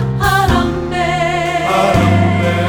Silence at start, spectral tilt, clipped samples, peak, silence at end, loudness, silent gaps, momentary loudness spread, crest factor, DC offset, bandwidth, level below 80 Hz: 0 s; -6 dB/octave; under 0.1%; -2 dBFS; 0 s; -13 LUFS; none; 5 LU; 12 dB; under 0.1%; over 20 kHz; -28 dBFS